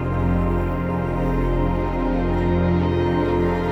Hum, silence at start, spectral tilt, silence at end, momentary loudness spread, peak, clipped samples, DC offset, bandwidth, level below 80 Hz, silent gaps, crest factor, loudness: none; 0 s; -9 dB/octave; 0 s; 3 LU; -8 dBFS; under 0.1%; under 0.1%; 6.2 kHz; -28 dBFS; none; 12 dB; -21 LUFS